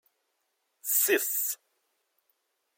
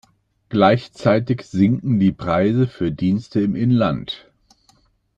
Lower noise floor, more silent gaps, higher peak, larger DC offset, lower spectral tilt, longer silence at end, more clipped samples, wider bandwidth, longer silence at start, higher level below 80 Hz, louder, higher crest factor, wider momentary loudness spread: first, -78 dBFS vs -59 dBFS; neither; second, -12 dBFS vs -2 dBFS; neither; second, 1 dB/octave vs -8.5 dB/octave; first, 1.2 s vs 1 s; neither; first, 16.5 kHz vs 8 kHz; first, 0.85 s vs 0.5 s; second, under -90 dBFS vs -50 dBFS; second, -26 LUFS vs -19 LUFS; about the same, 20 dB vs 16 dB; first, 15 LU vs 7 LU